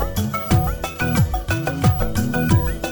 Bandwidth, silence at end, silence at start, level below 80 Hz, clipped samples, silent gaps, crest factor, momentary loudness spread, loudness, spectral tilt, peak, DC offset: over 20 kHz; 0 s; 0 s; -28 dBFS; under 0.1%; none; 16 dB; 5 LU; -20 LUFS; -6 dB/octave; -4 dBFS; under 0.1%